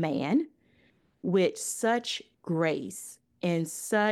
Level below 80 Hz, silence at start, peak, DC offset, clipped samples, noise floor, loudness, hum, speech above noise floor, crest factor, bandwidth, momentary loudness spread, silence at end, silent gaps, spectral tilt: -76 dBFS; 0 s; -12 dBFS; under 0.1%; under 0.1%; -66 dBFS; -30 LUFS; none; 38 dB; 16 dB; 15.5 kHz; 12 LU; 0 s; none; -4.5 dB/octave